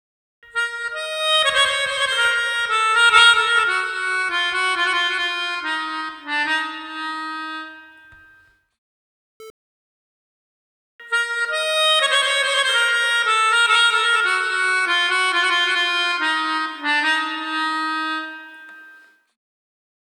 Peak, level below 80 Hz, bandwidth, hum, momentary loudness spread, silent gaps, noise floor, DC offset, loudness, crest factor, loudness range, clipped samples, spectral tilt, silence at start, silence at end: 0 dBFS; -64 dBFS; 15 kHz; none; 12 LU; 8.78-9.40 s, 9.50-10.99 s; -54 dBFS; under 0.1%; -18 LUFS; 20 dB; 11 LU; under 0.1%; 1 dB/octave; 0.55 s; 1.2 s